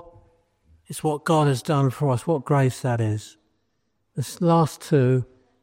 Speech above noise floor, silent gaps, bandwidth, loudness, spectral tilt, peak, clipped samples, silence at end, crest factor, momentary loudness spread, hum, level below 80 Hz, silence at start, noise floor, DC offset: 52 dB; none; 16 kHz; -23 LUFS; -7 dB/octave; -8 dBFS; under 0.1%; 0.4 s; 16 dB; 12 LU; none; -60 dBFS; 0.9 s; -73 dBFS; under 0.1%